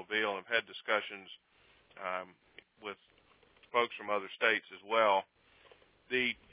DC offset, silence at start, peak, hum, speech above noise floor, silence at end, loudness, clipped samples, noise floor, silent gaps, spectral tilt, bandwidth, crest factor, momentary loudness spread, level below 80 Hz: under 0.1%; 0 s; -12 dBFS; none; 31 dB; 0.2 s; -33 LUFS; under 0.1%; -65 dBFS; none; 0.5 dB/octave; 4 kHz; 24 dB; 19 LU; -78 dBFS